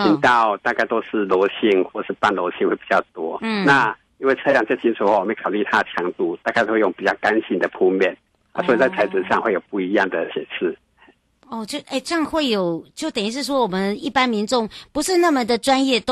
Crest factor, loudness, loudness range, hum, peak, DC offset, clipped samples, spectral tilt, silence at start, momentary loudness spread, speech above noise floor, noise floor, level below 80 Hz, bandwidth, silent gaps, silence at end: 16 dB; -20 LUFS; 4 LU; none; -4 dBFS; under 0.1%; under 0.1%; -4.5 dB/octave; 0 s; 9 LU; 35 dB; -55 dBFS; -58 dBFS; 12.5 kHz; none; 0 s